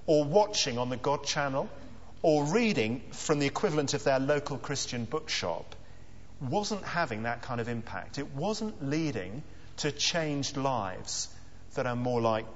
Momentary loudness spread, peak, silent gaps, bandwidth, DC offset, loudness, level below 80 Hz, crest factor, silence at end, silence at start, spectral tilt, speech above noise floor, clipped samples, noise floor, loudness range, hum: 12 LU; -10 dBFS; none; 8 kHz; 0.7%; -31 LUFS; -56 dBFS; 20 dB; 0 s; 0.05 s; -4 dB/octave; 21 dB; under 0.1%; -52 dBFS; 5 LU; none